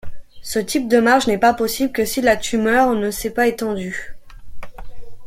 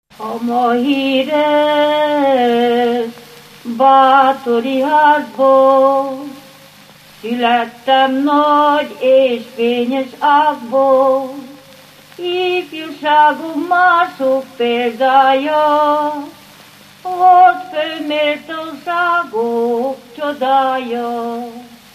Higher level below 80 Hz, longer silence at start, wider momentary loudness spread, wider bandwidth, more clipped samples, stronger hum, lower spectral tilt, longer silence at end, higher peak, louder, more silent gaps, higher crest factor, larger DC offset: first, -42 dBFS vs -66 dBFS; second, 0.05 s vs 0.2 s; about the same, 12 LU vs 13 LU; about the same, 16.5 kHz vs 15 kHz; neither; neither; about the same, -4 dB/octave vs -4.5 dB/octave; second, 0 s vs 0.2 s; about the same, -2 dBFS vs 0 dBFS; second, -18 LUFS vs -13 LUFS; neither; about the same, 16 dB vs 14 dB; neither